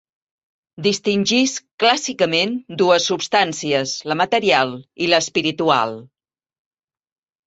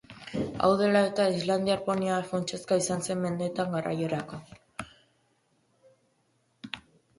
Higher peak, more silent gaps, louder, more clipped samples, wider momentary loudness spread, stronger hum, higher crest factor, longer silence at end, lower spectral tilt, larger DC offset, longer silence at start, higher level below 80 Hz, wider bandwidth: first, -2 dBFS vs -10 dBFS; first, 1.71-1.78 s vs none; first, -18 LUFS vs -28 LUFS; neither; second, 7 LU vs 19 LU; neither; about the same, 18 dB vs 20 dB; first, 1.4 s vs 0.4 s; second, -3 dB/octave vs -5 dB/octave; neither; first, 0.8 s vs 0.1 s; about the same, -64 dBFS vs -62 dBFS; second, 8.2 kHz vs 11.5 kHz